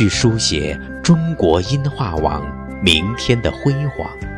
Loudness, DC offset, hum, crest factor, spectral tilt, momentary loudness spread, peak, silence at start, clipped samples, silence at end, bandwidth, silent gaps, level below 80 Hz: -17 LUFS; under 0.1%; none; 16 dB; -5 dB/octave; 9 LU; 0 dBFS; 0 s; under 0.1%; 0 s; 12.5 kHz; none; -32 dBFS